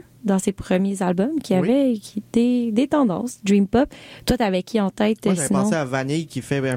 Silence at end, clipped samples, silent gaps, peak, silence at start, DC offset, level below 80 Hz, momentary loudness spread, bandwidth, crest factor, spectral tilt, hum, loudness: 0 s; under 0.1%; none; -6 dBFS; 0.25 s; under 0.1%; -46 dBFS; 6 LU; 16 kHz; 14 dB; -6 dB/octave; none; -21 LUFS